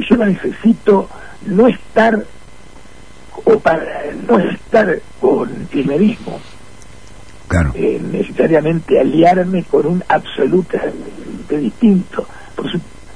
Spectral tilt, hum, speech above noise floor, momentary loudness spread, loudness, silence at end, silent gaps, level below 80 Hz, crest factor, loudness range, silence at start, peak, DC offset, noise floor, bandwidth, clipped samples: -7.5 dB/octave; none; 26 dB; 13 LU; -15 LUFS; 0.1 s; none; -36 dBFS; 16 dB; 3 LU; 0 s; 0 dBFS; 2%; -40 dBFS; 10.5 kHz; under 0.1%